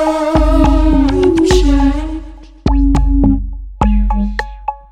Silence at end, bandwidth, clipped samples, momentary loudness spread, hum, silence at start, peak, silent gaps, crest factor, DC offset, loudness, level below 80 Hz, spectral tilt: 0.15 s; 9.8 kHz; under 0.1%; 12 LU; none; 0 s; 0 dBFS; none; 12 dB; under 0.1%; -13 LUFS; -16 dBFS; -7 dB/octave